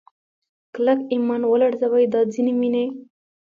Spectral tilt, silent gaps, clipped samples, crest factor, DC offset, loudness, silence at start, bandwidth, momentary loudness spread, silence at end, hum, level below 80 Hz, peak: -7 dB/octave; none; under 0.1%; 14 dB; under 0.1%; -20 LUFS; 0.75 s; 7.2 kHz; 8 LU; 0.35 s; none; -74 dBFS; -8 dBFS